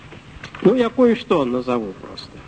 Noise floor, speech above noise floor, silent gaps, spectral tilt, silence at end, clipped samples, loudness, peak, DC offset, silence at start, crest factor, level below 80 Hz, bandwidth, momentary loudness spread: -38 dBFS; 20 dB; none; -7 dB/octave; 0.05 s; under 0.1%; -18 LUFS; -2 dBFS; 0.1%; 0.05 s; 18 dB; -50 dBFS; 9 kHz; 19 LU